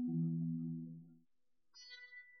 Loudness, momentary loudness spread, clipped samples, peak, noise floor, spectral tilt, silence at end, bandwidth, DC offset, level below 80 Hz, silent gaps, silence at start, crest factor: -43 LUFS; 18 LU; under 0.1%; -30 dBFS; -86 dBFS; -8 dB/octave; 0 s; 6.2 kHz; under 0.1%; under -90 dBFS; none; 0 s; 14 dB